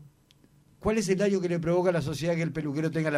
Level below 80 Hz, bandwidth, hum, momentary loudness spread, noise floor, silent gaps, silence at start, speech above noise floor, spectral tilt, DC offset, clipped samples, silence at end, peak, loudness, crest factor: -54 dBFS; 14.5 kHz; none; 5 LU; -61 dBFS; none; 0 s; 34 dB; -6.5 dB/octave; under 0.1%; under 0.1%; 0 s; -14 dBFS; -28 LUFS; 14 dB